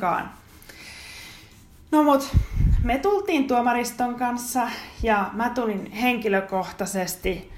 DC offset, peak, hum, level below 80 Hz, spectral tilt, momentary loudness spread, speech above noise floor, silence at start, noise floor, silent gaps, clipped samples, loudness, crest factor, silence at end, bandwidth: under 0.1%; -6 dBFS; none; -32 dBFS; -5.5 dB/octave; 18 LU; 26 dB; 0 s; -49 dBFS; none; under 0.1%; -24 LUFS; 18 dB; 0 s; 16 kHz